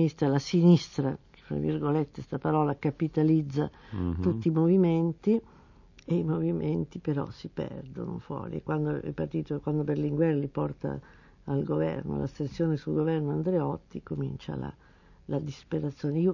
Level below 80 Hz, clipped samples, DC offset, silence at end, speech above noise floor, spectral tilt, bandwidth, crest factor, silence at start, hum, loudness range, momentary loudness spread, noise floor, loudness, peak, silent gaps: -52 dBFS; under 0.1%; under 0.1%; 0 s; 27 dB; -8.5 dB/octave; 7.4 kHz; 18 dB; 0 s; none; 6 LU; 13 LU; -55 dBFS; -29 LUFS; -10 dBFS; none